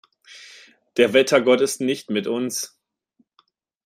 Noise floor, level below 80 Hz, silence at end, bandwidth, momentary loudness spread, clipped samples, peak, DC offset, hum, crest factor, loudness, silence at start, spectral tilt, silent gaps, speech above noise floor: -66 dBFS; -70 dBFS; 1.2 s; 16 kHz; 17 LU; under 0.1%; -2 dBFS; under 0.1%; none; 22 dB; -20 LUFS; 0.3 s; -3.5 dB/octave; none; 47 dB